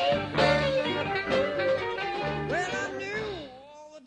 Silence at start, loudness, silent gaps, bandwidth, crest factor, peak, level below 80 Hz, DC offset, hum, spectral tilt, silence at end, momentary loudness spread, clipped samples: 0 s; -28 LUFS; none; 10 kHz; 18 dB; -10 dBFS; -52 dBFS; under 0.1%; none; -5 dB/octave; 0.1 s; 14 LU; under 0.1%